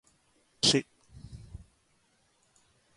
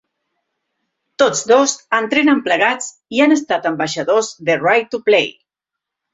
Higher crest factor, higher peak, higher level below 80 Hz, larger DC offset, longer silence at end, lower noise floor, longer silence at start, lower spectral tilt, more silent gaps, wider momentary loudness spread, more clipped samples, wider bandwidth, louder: first, 24 dB vs 16 dB; second, -12 dBFS vs 0 dBFS; about the same, -58 dBFS vs -62 dBFS; neither; first, 1.4 s vs 0.85 s; second, -70 dBFS vs -83 dBFS; second, 0.65 s vs 1.2 s; about the same, -3 dB/octave vs -3 dB/octave; neither; first, 27 LU vs 6 LU; neither; first, 11.5 kHz vs 8 kHz; second, -26 LUFS vs -15 LUFS